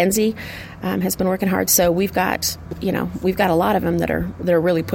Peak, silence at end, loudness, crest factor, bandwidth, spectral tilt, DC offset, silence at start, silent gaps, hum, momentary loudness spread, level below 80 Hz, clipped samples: -4 dBFS; 0 s; -19 LUFS; 16 dB; 17 kHz; -4.5 dB/octave; under 0.1%; 0 s; none; none; 9 LU; -42 dBFS; under 0.1%